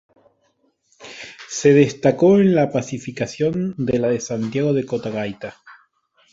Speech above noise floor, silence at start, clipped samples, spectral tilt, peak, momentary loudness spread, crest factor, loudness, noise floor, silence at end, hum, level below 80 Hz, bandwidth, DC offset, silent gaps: 47 dB; 1 s; under 0.1%; -6.5 dB/octave; -2 dBFS; 20 LU; 18 dB; -19 LUFS; -65 dBFS; 0.6 s; none; -56 dBFS; 8 kHz; under 0.1%; none